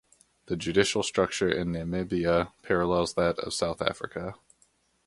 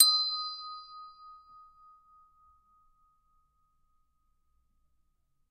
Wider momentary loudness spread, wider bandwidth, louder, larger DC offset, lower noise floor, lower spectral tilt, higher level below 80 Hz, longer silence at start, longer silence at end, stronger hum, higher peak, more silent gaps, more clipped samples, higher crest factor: second, 10 LU vs 27 LU; first, 11.5 kHz vs 10 kHz; about the same, -28 LUFS vs -28 LUFS; neither; second, -68 dBFS vs -73 dBFS; first, -4.5 dB/octave vs 5.5 dB/octave; first, -50 dBFS vs -74 dBFS; first, 0.5 s vs 0 s; second, 0.7 s vs 4.15 s; neither; about the same, -6 dBFS vs -4 dBFS; neither; neither; second, 22 dB vs 32 dB